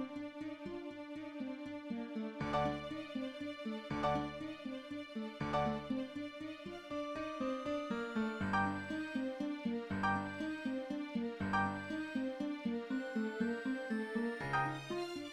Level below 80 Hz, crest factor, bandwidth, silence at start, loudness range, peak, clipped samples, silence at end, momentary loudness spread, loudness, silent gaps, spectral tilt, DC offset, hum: -64 dBFS; 18 dB; 13 kHz; 0 s; 3 LU; -22 dBFS; under 0.1%; 0 s; 9 LU; -40 LUFS; none; -6.5 dB/octave; under 0.1%; none